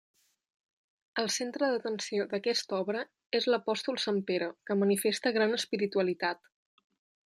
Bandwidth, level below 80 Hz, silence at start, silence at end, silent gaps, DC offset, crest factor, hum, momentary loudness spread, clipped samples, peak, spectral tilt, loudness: 15 kHz; -82 dBFS; 1.15 s; 1 s; 3.26-3.30 s; under 0.1%; 18 dB; none; 6 LU; under 0.1%; -16 dBFS; -3.5 dB/octave; -31 LUFS